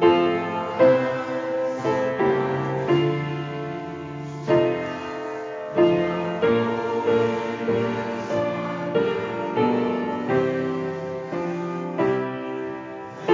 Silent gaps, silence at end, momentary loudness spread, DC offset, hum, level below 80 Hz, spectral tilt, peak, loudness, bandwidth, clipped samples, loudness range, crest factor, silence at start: none; 0 s; 11 LU; under 0.1%; none; -58 dBFS; -7.5 dB/octave; -4 dBFS; -24 LUFS; 7.6 kHz; under 0.1%; 3 LU; 18 dB; 0 s